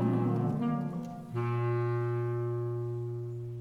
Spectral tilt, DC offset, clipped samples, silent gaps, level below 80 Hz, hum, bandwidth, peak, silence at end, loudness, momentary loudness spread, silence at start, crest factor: -10 dB/octave; under 0.1%; under 0.1%; none; -64 dBFS; none; 4.5 kHz; -18 dBFS; 0 s; -33 LUFS; 8 LU; 0 s; 14 dB